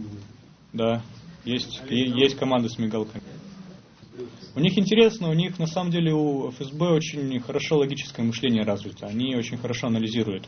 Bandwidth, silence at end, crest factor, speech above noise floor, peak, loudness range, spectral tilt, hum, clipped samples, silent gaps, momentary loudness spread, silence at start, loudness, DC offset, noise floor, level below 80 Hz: 6.6 kHz; 0 s; 22 dB; 25 dB; -4 dBFS; 3 LU; -6 dB/octave; none; under 0.1%; none; 19 LU; 0 s; -25 LUFS; under 0.1%; -49 dBFS; -60 dBFS